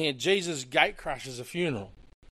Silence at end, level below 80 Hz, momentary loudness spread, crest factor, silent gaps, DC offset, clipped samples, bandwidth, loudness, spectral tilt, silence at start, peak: 0.3 s; -54 dBFS; 12 LU; 24 dB; none; under 0.1%; under 0.1%; 15 kHz; -29 LUFS; -3.5 dB/octave; 0 s; -6 dBFS